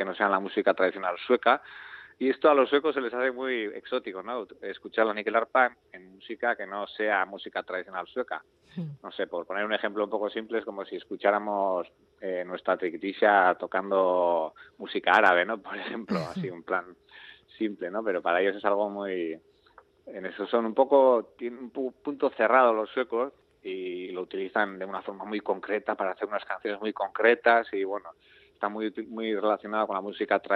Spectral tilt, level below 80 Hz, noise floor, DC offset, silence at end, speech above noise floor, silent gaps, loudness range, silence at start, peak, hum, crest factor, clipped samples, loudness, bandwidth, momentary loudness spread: -6.5 dB/octave; -76 dBFS; -59 dBFS; under 0.1%; 0 s; 31 dB; none; 7 LU; 0 s; -6 dBFS; none; 22 dB; under 0.1%; -28 LUFS; 7.6 kHz; 14 LU